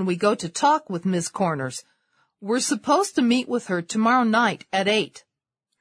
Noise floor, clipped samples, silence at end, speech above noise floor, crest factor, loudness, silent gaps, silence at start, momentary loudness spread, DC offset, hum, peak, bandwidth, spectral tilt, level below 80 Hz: -81 dBFS; under 0.1%; 0.6 s; 59 dB; 16 dB; -22 LUFS; none; 0 s; 8 LU; under 0.1%; none; -6 dBFS; 11 kHz; -4 dB/octave; -70 dBFS